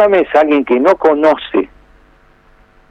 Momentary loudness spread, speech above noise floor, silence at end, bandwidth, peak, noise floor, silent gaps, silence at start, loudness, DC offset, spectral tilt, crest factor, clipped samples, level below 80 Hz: 8 LU; 36 dB; 1.25 s; 7.4 kHz; 0 dBFS; -47 dBFS; none; 0 s; -12 LUFS; under 0.1%; -6 dB/octave; 12 dB; under 0.1%; -48 dBFS